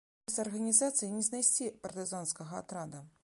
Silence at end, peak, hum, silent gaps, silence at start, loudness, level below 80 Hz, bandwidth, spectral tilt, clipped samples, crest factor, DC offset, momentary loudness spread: 0.15 s; -12 dBFS; none; none; 0.3 s; -32 LUFS; -76 dBFS; 12 kHz; -3 dB/octave; under 0.1%; 22 dB; under 0.1%; 15 LU